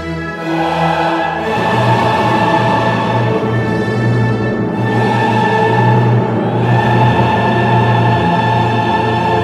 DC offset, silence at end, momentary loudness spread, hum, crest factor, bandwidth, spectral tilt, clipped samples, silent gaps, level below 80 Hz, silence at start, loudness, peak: under 0.1%; 0 s; 5 LU; none; 12 dB; 9.8 kHz; -7.5 dB/octave; under 0.1%; none; -40 dBFS; 0 s; -13 LUFS; 0 dBFS